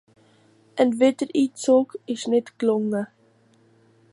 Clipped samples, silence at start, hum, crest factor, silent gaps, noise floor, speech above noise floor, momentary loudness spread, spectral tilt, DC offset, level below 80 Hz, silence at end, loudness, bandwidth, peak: under 0.1%; 0.75 s; none; 18 dB; none; -59 dBFS; 38 dB; 10 LU; -5 dB/octave; under 0.1%; -76 dBFS; 1.05 s; -22 LUFS; 11.5 kHz; -6 dBFS